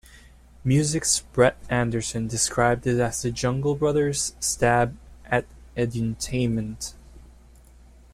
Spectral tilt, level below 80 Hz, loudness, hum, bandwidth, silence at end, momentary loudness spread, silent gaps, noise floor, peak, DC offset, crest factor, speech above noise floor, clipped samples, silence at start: -4.5 dB/octave; -44 dBFS; -24 LUFS; none; 15.5 kHz; 0.85 s; 8 LU; none; -50 dBFS; -6 dBFS; under 0.1%; 18 dB; 27 dB; under 0.1%; 0.1 s